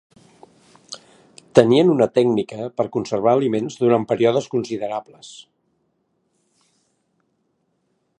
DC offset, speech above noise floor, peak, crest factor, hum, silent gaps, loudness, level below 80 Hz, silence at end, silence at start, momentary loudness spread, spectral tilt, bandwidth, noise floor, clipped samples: under 0.1%; 51 dB; 0 dBFS; 22 dB; none; none; -19 LUFS; -64 dBFS; 2.8 s; 0.9 s; 23 LU; -6.5 dB/octave; 9.8 kHz; -69 dBFS; under 0.1%